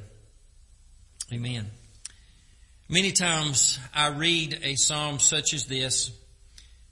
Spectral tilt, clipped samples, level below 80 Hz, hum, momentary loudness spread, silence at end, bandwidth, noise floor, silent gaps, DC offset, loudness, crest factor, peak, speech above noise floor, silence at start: -1.5 dB/octave; under 0.1%; -54 dBFS; none; 20 LU; 0.3 s; 11.5 kHz; -55 dBFS; none; under 0.1%; -24 LUFS; 24 dB; -6 dBFS; 29 dB; 0 s